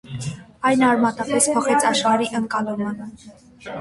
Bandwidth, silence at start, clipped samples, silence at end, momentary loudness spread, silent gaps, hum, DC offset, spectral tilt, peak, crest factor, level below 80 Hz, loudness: 12 kHz; 0.05 s; under 0.1%; 0 s; 17 LU; none; none; under 0.1%; -3.5 dB/octave; -4 dBFS; 18 dB; -58 dBFS; -19 LUFS